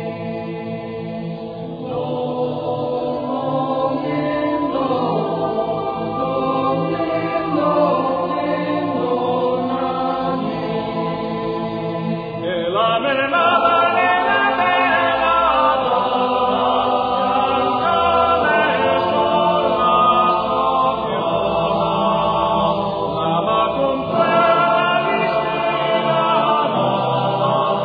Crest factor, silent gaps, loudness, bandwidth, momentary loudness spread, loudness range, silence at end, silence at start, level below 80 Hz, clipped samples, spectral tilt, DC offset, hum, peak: 16 dB; none; -18 LUFS; 5 kHz; 8 LU; 6 LU; 0 s; 0 s; -48 dBFS; under 0.1%; -8.5 dB/octave; under 0.1%; none; -2 dBFS